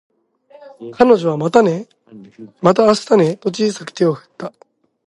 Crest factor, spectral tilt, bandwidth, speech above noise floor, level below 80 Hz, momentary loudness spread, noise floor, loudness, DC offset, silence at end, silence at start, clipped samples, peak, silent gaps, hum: 16 dB; -6 dB/octave; 11.5 kHz; 32 dB; -60 dBFS; 19 LU; -48 dBFS; -15 LUFS; under 0.1%; 0.6 s; 0.8 s; under 0.1%; 0 dBFS; none; none